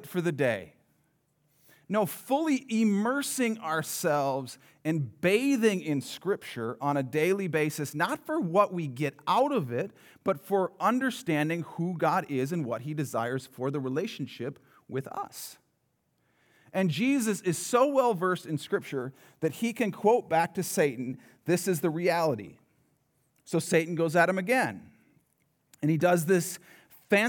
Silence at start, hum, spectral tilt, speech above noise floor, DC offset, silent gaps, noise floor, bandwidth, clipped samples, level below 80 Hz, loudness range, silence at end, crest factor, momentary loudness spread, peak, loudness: 0 s; none; -5.5 dB/octave; 46 dB; under 0.1%; none; -75 dBFS; over 20 kHz; under 0.1%; -82 dBFS; 5 LU; 0 s; 20 dB; 11 LU; -10 dBFS; -29 LUFS